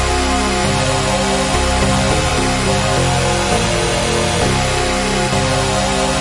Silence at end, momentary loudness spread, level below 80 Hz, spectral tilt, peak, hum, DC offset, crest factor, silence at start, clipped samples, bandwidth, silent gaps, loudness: 0 s; 1 LU; -26 dBFS; -4 dB/octave; -4 dBFS; none; under 0.1%; 12 dB; 0 s; under 0.1%; 11.5 kHz; none; -15 LUFS